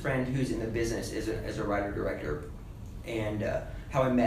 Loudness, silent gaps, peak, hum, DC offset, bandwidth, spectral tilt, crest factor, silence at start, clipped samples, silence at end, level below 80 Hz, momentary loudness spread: -33 LUFS; none; -12 dBFS; none; under 0.1%; 15.5 kHz; -6.5 dB/octave; 18 dB; 0 s; under 0.1%; 0 s; -44 dBFS; 10 LU